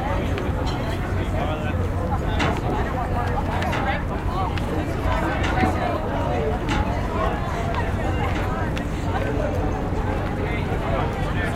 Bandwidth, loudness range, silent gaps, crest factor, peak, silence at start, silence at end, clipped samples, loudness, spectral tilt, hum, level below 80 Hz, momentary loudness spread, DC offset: 15.5 kHz; 1 LU; none; 18 dB; -6 dBFS; 0 s; 0 s; under 0.1%; -24 LUFS; -7 dB/octave; none; -28 dBFS; 3 LU; under 0.1%